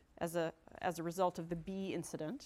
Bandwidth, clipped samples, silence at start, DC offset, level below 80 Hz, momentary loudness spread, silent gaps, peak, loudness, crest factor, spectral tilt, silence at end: 16.5 kHz; under 0.1%; 0.2 s; under 0.1%; -66 dBFS; 6 LU; none; -22 dBFS; -41 LUFS; 18 dB; -5.5 dB/octave; 0 s